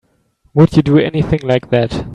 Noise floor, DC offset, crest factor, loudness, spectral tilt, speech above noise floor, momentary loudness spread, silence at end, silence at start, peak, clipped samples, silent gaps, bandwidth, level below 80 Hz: -57 dBFS; under 0.1%; 14 dB; -13 LUFS; -8.5 dB/octave; 44 dB; 6 LU; 0 s; 0.55 s; 0 dBFS; under 0.1%; none; 9.6 kHz; -36 dBFS